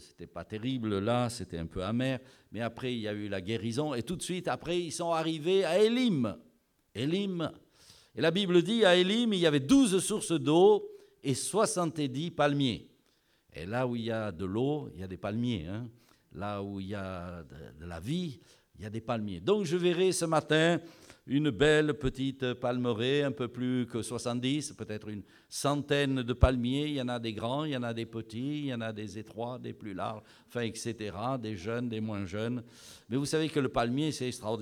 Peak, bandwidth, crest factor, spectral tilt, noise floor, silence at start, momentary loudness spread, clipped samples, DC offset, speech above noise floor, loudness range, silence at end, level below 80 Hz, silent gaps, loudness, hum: -10 dBFS; 16 kHz; 22 dB; -5 dB/octave; -70 dBFS; 0 s; 16 LU; under 0.1%; under 0.1%; 40 dB; 10 LU; 0 s; -50 dBFS; none; -31 LUFS; none